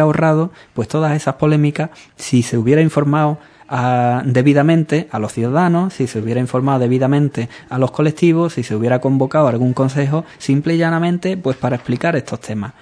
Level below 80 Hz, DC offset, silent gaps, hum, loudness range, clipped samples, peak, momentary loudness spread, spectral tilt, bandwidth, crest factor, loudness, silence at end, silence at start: -54 dBFS; under 0.1%; none; none; 2 LU; under 0.1%; 0 dBFS; 9 LU; -7.5 dB/octave; 11 kHz; 14 dB; -16 LUFS; 0.1 s; 0 s